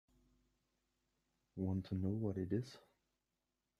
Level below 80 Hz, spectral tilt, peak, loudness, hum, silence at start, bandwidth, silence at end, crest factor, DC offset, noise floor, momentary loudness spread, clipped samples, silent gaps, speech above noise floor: -74 dBFS; -9 dB/octave; -26 dBFS; -42 LUFS; none; 1.55 s; 10.5 kHz; 1 s; 20 dB; under 0.1%; -89 dBFS; 15 LU; under 0.1%; none; 49 dB